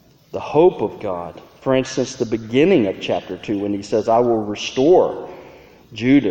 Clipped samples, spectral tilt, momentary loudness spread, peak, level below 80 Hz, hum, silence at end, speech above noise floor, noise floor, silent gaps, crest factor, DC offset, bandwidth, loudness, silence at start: under 0.1%; -6 dB/octave; 15 LU; -2 dBFS; -50 dBFS; none; 0 s; 26 dB; -44 dBFS; none; 16 dB; under 0.1%; 8.6 kHz; -19 LUFS; 0.35 s